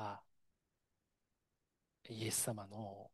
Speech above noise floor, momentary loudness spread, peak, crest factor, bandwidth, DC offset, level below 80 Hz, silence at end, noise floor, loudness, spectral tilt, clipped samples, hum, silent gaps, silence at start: 44 dB; 15 LU; -24 dBFS; 24 dB; 12.5 kHz; under 0.1%; -82 dBFS; 0.05 s; -88 dBFS; -42 LUFS; -3.5 dB/octave; under 0.1%; none; none; 0 s